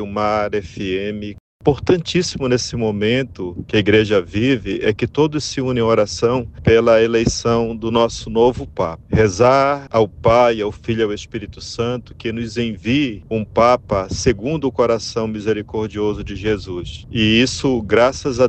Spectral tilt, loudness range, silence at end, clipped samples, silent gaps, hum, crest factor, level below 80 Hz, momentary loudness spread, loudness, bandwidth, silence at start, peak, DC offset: -5.5 dB/octave; 4 LU; 0 s; under 0.1%; 1.40-1.60 s; none; 16 dB; -38 dBFS; 10 LU; -18 LUFS; 8.8 kHz; 0 s; -2 dBFS; under 0.1%